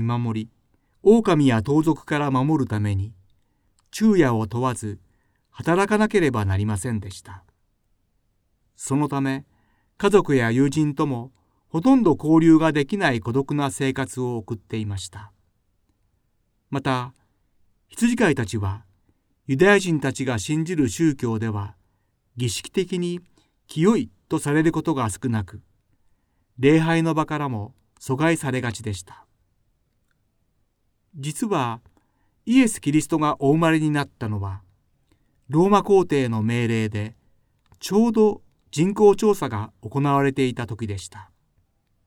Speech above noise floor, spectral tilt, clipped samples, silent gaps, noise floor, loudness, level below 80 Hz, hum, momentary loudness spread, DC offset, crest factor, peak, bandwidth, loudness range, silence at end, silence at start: 48 dB; -6 dB/octave; under 0.1%; none; -69 dBFS; -22 LUFS; -52 dBFS; none; 16 LU; under 0.1%; 20 dB; -4 dBFS; 17 kHz; 8 LU; 0.85 s; 0 s